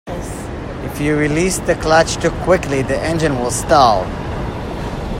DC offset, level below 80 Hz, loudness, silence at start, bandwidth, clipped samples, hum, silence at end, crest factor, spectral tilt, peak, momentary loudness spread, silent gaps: under 0.1%; -30 dBFS; -17 LUFS; 0.05 s; 16 kHz; under 0.1%; none; 0 s; 16 dB; -5 dB/octave; 0 dBFS; 14 LU; none